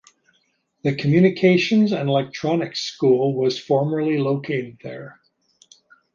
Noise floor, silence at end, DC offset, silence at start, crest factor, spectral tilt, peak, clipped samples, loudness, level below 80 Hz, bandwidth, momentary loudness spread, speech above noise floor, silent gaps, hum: -67 dBFS; 1.05 s; under 0.1%; 0.85 s; 18 dB; -6.5 dB/octave; -4 dBFS; under 0.1%; -20 LUFS; -64 dBFS; 7.4 kHz; 11 LU; 47 dB; none; none